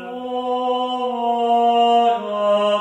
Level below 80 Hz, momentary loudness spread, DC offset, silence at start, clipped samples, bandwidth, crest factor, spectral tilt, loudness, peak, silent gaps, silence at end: -68 dBFS; 8 LU; under 0.1%; 0 s; under 0.1%; 9 kHz; 12 dB; -5 dB/octave; -19 LUFS; -6 dBFS; none; 0 s